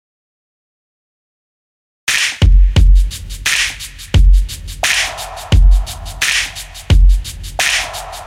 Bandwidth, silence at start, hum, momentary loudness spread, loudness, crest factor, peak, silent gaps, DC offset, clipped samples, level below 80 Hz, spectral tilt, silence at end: 15 kHz; 2.05 s; none; 11 LU; -14 LUFS; 14 dB; 0 dBFS; none; under 0.1%; under 0.1%; -14 dBFS; -3 dB/octave; 0 s